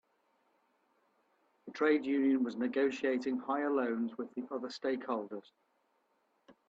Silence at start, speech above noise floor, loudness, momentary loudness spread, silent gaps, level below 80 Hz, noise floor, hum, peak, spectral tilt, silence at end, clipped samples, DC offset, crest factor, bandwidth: 1.65 s; 43 dB; -34 LUFS; 11 LU; none; -84 dBFS; -77 dBFS; none; -18 dBFS; -5.5 dB/octave; 0.15 s; under 0.1%; under 0.1%; 18 dB; 7.6 kHz